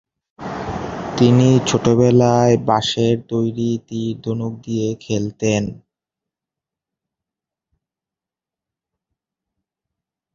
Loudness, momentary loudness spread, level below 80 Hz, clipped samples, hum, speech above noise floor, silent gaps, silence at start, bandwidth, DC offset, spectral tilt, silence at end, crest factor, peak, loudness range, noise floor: -18 LUFS; 13 LU; -48 dBFS; under 0.1%; none; 72 dB; none; 0.4 s; 7.8 kHz; under 0.1%; -6.5 dB/octave; 4.55 s; 18 dB; -2 dBFS; 11 LU; -88 dBFS